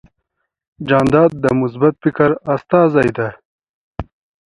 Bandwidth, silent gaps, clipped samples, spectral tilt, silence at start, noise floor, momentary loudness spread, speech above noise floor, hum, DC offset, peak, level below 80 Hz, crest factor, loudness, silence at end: 11 kHz; 3.45-3.59 s, 3.69-3.93 s; under 0.1%; -8 dB/octave; 0.8 s; -73 dBFS; 19 LU; 59 dB; none; under 0.1%; 0 dBFS; -44 dBFS; 16 dB; -15 LUFS; 0.45 s